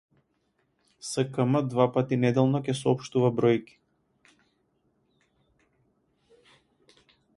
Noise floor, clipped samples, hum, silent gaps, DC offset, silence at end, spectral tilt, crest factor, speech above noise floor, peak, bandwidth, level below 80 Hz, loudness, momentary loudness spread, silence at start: -73 dBFS; under 0.1%; none; none; under 0.1%; 3.75 s; -7 dB/octave; 22 dB; 48 dB; -8 dBFS; 11.5 kHz; -68 dBFS; -26 LUFS; 6 LU; 1.05 s